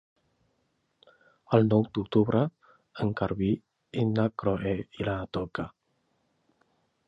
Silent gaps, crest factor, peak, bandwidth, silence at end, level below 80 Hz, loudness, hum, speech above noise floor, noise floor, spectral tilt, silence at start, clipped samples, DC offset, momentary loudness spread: none; 22 dB; -8 dBFS; 5.8 kHz; 1.4 s; -54 dBFS; -28 LUFS; none; 48 dB; -74 dBFS; -9.5 dB/octave; 1.5 s; under 0.1%; under 0.1%; 11 LU